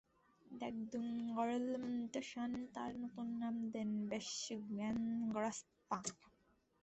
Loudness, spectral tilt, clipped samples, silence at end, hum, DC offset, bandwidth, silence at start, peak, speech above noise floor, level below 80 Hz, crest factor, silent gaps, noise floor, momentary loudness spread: -43 LUFS; -4.5 dB/octave; under 0.1%; 0.55 s; none; under 0.1%; 8.2 kHz; 0.45 s; -26 dBFS; 34 dB; -78 dBFS; 18 dB; none; -77 dBFS; 6 LU